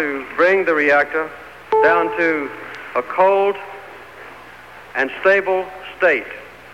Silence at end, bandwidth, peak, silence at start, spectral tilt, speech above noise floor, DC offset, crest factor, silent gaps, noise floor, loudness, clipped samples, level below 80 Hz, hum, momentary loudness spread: 0 s; 15.5 kHz; -4 dBFS; 0 s; -5 dB/octave; 22 dB; 0.2%; 16 dB; none; -39 dBFS; -17 LUFS; under 0.1%; -58 dBFS; none; 22 LU